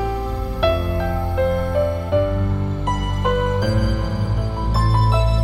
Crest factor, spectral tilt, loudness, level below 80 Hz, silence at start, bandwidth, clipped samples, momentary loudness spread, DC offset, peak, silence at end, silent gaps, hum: 14 dB; -7.5 dB/octave; -20 LUFS; -24 dBFS; 0 s; 14 kHz; under 0.1%; 5 LU; under 0.1%; -4 dBFS; 0 s; none; none